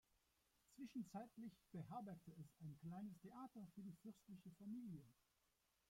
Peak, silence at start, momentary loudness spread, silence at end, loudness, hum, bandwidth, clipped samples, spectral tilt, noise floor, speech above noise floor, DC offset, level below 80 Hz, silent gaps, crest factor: -40 dBFS; 0.7 s; 7 LU; 0.75 s; -58 LUFS; none; 16.5 kHz; under 0.1%; -7.5 dB/octave; -86 dBFS; 29 dB; under 0.1%; -86 dBFS; none; 18 dB